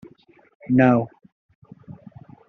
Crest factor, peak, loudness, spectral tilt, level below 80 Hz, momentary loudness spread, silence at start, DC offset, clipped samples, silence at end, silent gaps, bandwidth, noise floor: 20 dB; -4 dBFS; -19 LUFS; -8 dB/octave; -62 dBFS; 27 LU; 0.7 s; under 0.1%; under 0.1%; 0.55 s; 1.32-1.49 s, 1.55-1.62 s; 4 kHz; -52 dBFS